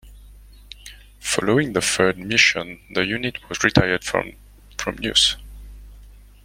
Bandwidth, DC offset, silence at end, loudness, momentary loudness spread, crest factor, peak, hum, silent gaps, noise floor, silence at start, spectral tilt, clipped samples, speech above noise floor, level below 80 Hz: 16.5 kHz; under 0.1%; 0.3 s; -20 LUFS; 18 LU; 22 dB; 0 dBFS; 50 Hz at -45 dBFS; none; -45 dBFS; 0.05 s; -3 dB/octave; under 0.1%; 24 dB; -42 dBFS